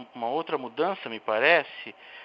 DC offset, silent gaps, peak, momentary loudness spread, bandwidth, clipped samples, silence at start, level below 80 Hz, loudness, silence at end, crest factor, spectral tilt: under 0.1%; none; -4 dBFS; 18 LU; 5.8 kHz; under 0.1%; 0 s; -84 dBFS; -26 LUFS; 0 s; 22 dB; -6.5 dB/octave